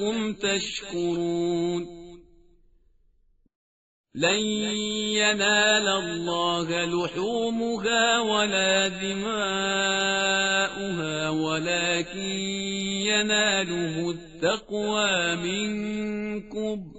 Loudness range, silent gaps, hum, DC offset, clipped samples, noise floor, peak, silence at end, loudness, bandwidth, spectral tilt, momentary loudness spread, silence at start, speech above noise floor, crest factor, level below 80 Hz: 7 LU; 3.55-4.04 s; none; under 0.1%; under 0.1%; -63 dBFS; -8 dBFS; 0 s; -25 LUFS; 8 kHz; -2 dB/octave; 9 LU; 0 s; 37 dB; 18 dB; -56 dBFS